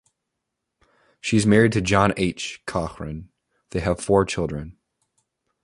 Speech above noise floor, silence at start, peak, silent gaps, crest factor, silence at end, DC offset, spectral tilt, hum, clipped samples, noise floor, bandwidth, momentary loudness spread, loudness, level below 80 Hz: 60 dB; 1.25 s; -2 dBFS; none; 22 dB; 0.9 s; under 0.1%; -5.5 dB/octave; none; under 0.1%; -81 dBFS; 11.5 kHz; 17 LU; -22 LUFS; -44 dBFS